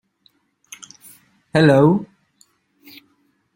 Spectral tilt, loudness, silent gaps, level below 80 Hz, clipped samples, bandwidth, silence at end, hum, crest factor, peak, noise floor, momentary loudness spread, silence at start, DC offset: -7 dB/octave; -15 LUFS; none; -58 dBFS; under 0.1%; 16.5 kHz; 1.5 s; none; 20 dB; -2 dBFS; -63 dBFS; 28 LU; 1.55 s; under 0.1%